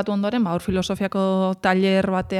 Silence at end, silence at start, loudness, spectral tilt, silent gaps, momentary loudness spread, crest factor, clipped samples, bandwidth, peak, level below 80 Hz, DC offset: 0 s; 0 s; -21 LUFS; -6.5 dB/octave; none; 5 LU; 14 dB; under 0.1%; 12.5 kHz; -6 dBFS; -50 dBFS; under 0.1%